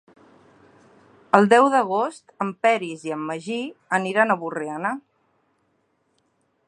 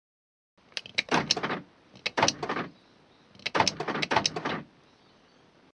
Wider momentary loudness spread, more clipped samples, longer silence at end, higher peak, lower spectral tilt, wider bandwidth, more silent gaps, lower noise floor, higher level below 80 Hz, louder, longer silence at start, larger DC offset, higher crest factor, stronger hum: first, 14 LU vs 11 LU; neither; first, 1.7 s vs 1.1 s; first, 0 dBFS vs -6 dBFS; first, -5.5 dB/octave vs -2.5 dB/octave; about the same, 11 kHz vs 10.5 kHz; neither; first, -68 dBFS vs -60 dBFS; second, -76 dBFS vs -64 dBFS; first, -22 LUFS vs -29 LUFS; first, 1.35 s vs 0.75 s; neither; about the same, 24 dB vs 26 dB; neither